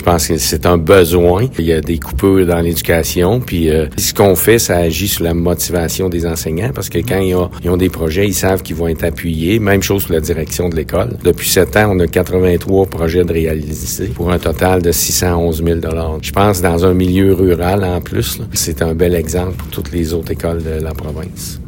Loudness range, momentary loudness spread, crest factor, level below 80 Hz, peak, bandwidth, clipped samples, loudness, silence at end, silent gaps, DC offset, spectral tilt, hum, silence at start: 3 LU; 8 LU; 14 dB; -28 dBFS; 0 dBFS; 17 kHz; 0.2%; -14 LUFS; 0 s; none; under 0.1%; -5 dB/octave; none; 0 s